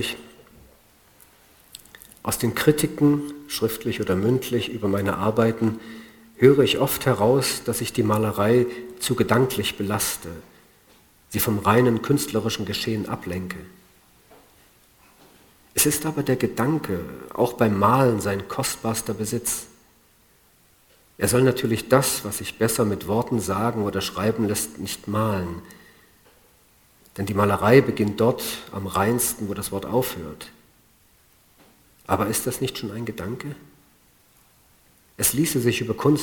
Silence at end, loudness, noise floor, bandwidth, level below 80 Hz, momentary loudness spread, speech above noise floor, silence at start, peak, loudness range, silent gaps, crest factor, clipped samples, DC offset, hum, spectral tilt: 0 s; -23 LUFS; -58 dBFS; over 20 kHz; -52 dBFS; 13 LU; 36 dB; 0 s; 0 dBFS; 8 LU; none; 24 dB; under 0.1%; under 0.1%; none; -5 dB/octave